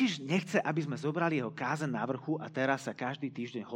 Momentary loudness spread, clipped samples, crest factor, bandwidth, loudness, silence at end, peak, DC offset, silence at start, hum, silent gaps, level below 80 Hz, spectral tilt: 7 LU; under 0.1%; 20 dB; 15.5 kHz; -34 LUFS; 0 s; -12 dBFS; under 0.1%; 0 s; none; none; -84 dBFS; -6 dB/octave